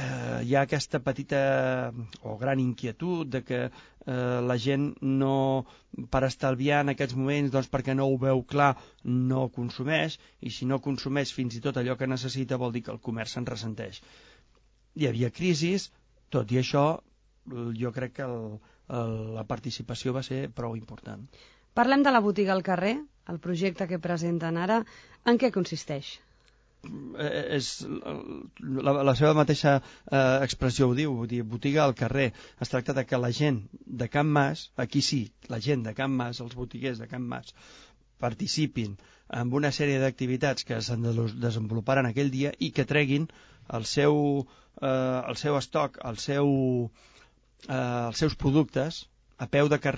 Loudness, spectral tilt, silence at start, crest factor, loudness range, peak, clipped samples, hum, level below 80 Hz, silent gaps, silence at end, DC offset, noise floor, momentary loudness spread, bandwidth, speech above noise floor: -28 LUFS; -6 dB/octave; 0 s; 20 dB; 7 LU; -8 dBFS; under 0.1%; none; -54 dBFS; none; 0 s; under 0.1%; -63 dBFS; 13 LU; 8 kHz; 36 dB